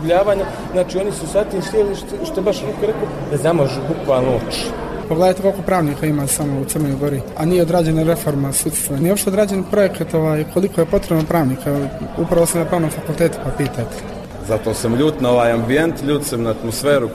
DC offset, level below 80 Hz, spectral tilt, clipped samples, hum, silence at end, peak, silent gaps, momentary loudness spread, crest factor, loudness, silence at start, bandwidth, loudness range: under 0.1%; -36 dBFS; -5.5 dB/octave; under 0.1%; none; 0 s; -4 dBFS; none; 7 LU; 14 dB; -18 LUFS; 0 s; 14 kHz; 2 LU